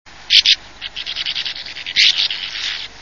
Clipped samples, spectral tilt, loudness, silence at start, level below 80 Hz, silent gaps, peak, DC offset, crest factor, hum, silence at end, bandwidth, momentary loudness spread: under 0.1%; 2 dB/octave; -15 LUFS; 0.05 s; -52 dBFS; none; 0 dBFS; 0.6%; 18 dB; none; 0 s; 11 kHz; 15 LU